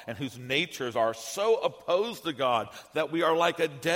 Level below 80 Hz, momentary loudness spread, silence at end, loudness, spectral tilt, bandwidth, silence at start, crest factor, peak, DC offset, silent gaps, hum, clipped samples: -72 dBFS; 7 LU; 0 s; -28 LUFS; -4 dB/octave; 16.5 kHz; 0 s; 18 dB; -10 dBFS; under 0.1%; none; none; under 0.1%